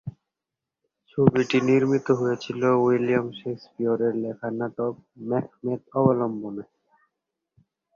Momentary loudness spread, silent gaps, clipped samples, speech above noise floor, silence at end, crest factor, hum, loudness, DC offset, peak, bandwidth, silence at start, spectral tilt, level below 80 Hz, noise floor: 14 LU; none; under 0.1%; 63 dB; 1.3 s; 24 dB; none; -24 LUFS; under 0.1%; -2 dBFS; 7.4 kHz; 0.05 s; -7.5 dB/octave; -64 dBFS; -87 dBFS